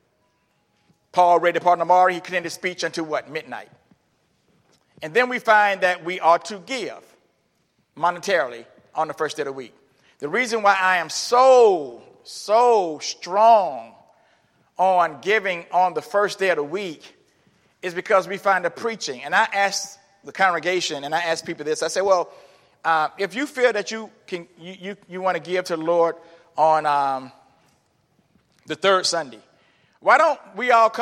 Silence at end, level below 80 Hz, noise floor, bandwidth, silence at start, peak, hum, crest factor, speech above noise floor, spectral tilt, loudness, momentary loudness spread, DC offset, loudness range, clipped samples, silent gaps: 0 s; -80 dBFS; -67 dBFS; 15 kHz; 1.15 s; -2 dBFS; none; 20 dB; 47 dB; -3 dB/octave; -20 LUFS; 17 LU; under 0.1%; 6 LU; under 0.1%; none